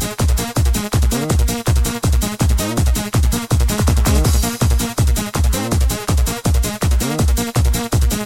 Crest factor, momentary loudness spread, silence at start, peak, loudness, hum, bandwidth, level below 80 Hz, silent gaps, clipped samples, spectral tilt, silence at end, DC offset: 12 dB; 2 LU; 0 s; -2 dBFS; -17 LUFS; none; 17 kHz; -18 dBFS; none; under 0.1%; -5 dB/octave; 0 s; under 0.1%